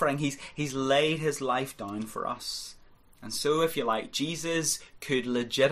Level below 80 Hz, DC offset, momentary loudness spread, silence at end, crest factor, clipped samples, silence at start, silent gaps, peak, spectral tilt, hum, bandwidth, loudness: -60 dBFS; under 0.1%; 10 LU; 0 s; 18 dB; under 0.1%; 0 s; none; -12 dBFS; -3.5 dB/octave; none; 15.5 kHz; -29 LUFS